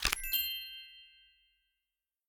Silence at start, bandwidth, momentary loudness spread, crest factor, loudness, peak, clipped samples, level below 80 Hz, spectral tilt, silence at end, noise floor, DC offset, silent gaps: 0 s; over 20 kHz; 21 LU; 32 dB; -34 LUFS; -8 dBFS; under 0.1%; -52 dBFS; 0.5 dB/octave; 1.2 s; under -90 dBFS; under 0.1%; none